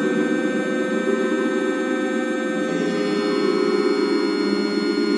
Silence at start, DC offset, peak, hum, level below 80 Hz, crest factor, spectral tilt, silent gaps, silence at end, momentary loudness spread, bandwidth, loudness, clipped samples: 0 s; under 0.1%; -8 dBFS; none; -78 dBFS; 14 dB; -5 dB/octave; none; 0 s; 3 LU; 11 kHz; -21 LUFS; under 0.1%